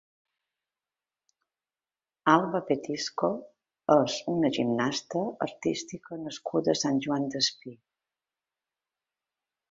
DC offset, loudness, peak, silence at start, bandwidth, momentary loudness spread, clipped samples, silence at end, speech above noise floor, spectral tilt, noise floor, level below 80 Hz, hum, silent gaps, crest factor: under 0.1%; -28 LUFS; -6 dBFS; 2.25 s; 7.8 kHz; 13 LU; under 0.1%; 1.95 s; over 62 dB; -4.5 dB/octave; under -90 dBFS; -70 dBFS; none; none; 26 dB